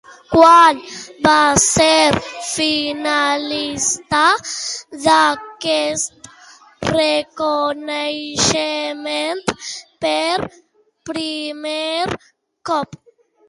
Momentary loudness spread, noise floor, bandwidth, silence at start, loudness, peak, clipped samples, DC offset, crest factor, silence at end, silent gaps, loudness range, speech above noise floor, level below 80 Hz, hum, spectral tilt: 13 LU; -45 dBFS; 11.5 kHz; 0.1 s; -16 LUFS; 0 dBFS; under 0.1%; under 0.1%; 18 dB; 0.55 s; none; 8 LU; 28 dB; -48 dBFS; none; -2.5 dB/octave